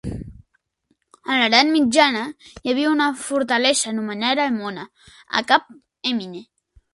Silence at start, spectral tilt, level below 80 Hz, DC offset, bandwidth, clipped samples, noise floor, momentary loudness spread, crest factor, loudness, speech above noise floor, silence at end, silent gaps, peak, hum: 0.05 s; -2.5 dB/octave; -50 dBFS; under 0.1%; 11.5 kHz; under 0.1%; -69 dBFS; 19 LU; 22 dB; -19 LUFS; 49 dB; 0.5 s; none; 0 dBFS; none